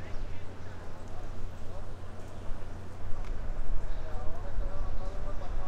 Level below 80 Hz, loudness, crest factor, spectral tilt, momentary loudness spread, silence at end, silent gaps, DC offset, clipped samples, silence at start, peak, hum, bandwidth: -34 dBFS; -43 LUFS; 12 dB; -6.5 dB/octave; 6 LU; 0 s; none; under 0.1%; under 0.1%; 0 s; -14 dBFS; none; 4.3 kHz